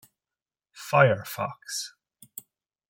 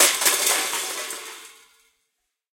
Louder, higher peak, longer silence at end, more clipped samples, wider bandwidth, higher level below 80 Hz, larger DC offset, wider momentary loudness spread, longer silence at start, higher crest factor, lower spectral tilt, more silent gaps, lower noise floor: second, -25 LUFS vs -20 LUFS; second, -6 dBFS vs -2 dBFS; about the same, 1 s vs 1 s; neither; about the same, 17 kHz vs 17 kHz; about the same, -74 dBFS vs -78 dBFS; neither; first, 23 LU vs 20 LU; first, 0.75 s vs 0 s; about the same, 24 dB vs 22 dB; first, -4.5 dB/octave vs 2.5 dB/octave; neither; first, under -90 dBFS vs -77 dBFS